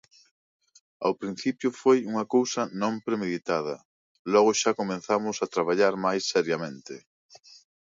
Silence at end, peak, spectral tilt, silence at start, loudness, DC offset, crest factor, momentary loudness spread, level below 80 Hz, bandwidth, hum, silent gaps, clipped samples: 0.85 s; -8 dBFS; -4 dB/octave; 1 s; -26 LUFS; under 0.1%; 18 dB; 13 LU; -74 dBFS; 7.8 kHz; none; 3.85-4.25 s; under 0.1%